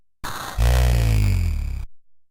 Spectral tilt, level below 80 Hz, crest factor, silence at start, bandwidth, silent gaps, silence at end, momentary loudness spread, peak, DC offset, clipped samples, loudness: -5.5 dB/octave; -22 dBFS; 12 dB; 0.25 s; 16.5 kHz; none; 0.3 s; 15 LU; -8 dBFS; under 0.1%; under 0.1%; -22 LUFS